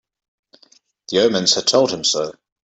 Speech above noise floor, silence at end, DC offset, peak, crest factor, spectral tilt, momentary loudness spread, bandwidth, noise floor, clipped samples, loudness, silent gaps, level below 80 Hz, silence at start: 38 dB; 0.35 s; under 0.1%; -2 dBFS; 18 dB; -2.5 dB/octave; 8 LU; 8.4 kHz; -55 dBFS; under 0.1%; -17 LUFS; none; -64 dBFS; 1.1 s